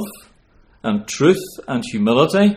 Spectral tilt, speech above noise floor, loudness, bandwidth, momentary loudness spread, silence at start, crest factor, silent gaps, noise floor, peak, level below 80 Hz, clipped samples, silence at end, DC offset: -5.5 dB/octave; 36 dB; -18 LUFS; 15.5 kHz; 11 LU; 0 s; 18 dB; none; -53 dBFS; 0 dBFS; -54 dBFS; under 0.1%; 0 s; under 0.1%